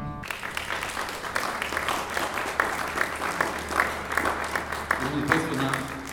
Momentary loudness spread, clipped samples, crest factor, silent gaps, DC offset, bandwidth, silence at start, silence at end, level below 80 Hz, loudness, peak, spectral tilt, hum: 6 LU; under 0.1%; 24 dB; none; under 0.1%; 19 kHz; 0 s; 0 s; -48 dBFS; -27 LUFS; -4 dBFS; -3.5 dB/octave; none